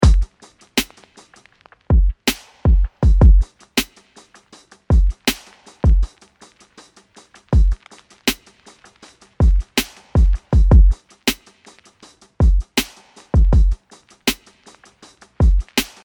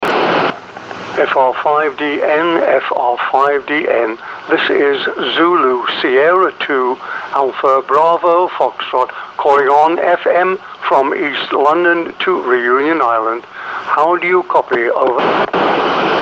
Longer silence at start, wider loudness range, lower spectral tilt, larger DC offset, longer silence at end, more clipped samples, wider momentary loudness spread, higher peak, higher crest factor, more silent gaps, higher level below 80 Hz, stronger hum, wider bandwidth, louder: about the same, 0 s vs 0 s; first, 4 LU vs 1 LU; about the same, -5 dB/octave vs -5.5 dB/octave; neither; first, 0.2 s vs 0 s; neither; first, 12 LU vs 7 LU; about the same, -2 dBFS vs 0 dBFS; about the same, 16 dB vs 12 dB; neither; first, -18 dBFS vs -60 dBFS; neither; first, 19.5 kHz vs 7.8 kHz; second, -18 LUFS vs -13 LUFS